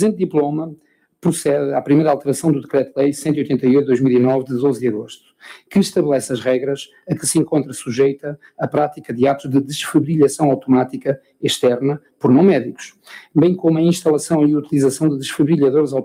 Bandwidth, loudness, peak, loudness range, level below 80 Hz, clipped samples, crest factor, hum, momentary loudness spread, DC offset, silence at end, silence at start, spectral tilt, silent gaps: 16 kHz; -17 LUFS; -2 dBFS; 3 LU; -60 dBFS; under 0.1%; 14 dB; none; 9 LU; under 0.1%; 0 s; 0 s; -6 dB/octave; none